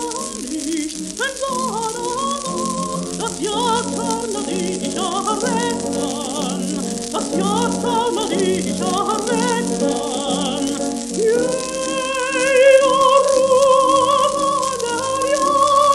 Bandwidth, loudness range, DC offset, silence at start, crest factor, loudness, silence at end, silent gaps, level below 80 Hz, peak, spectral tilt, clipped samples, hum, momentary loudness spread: 13 kHz; 7 LU; under 0.1%; 0 s; 16 dB; -18 LUFS; 0 s; none; -50 dBFS; -2 dBFS; -3.5 dB/octave; under 0.1%; none; 10 LU